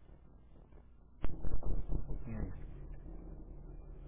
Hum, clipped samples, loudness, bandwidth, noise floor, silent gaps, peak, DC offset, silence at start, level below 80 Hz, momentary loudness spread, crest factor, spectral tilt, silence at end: none; under 0.1%; -47 LUFS; 3.4 kHz; -58 dBFS; none; -22 dBFS; under 0.1%; 0.1 s; -44 dBFS; 19 LU; 14 dB; -10.5 dB/octave; 0 s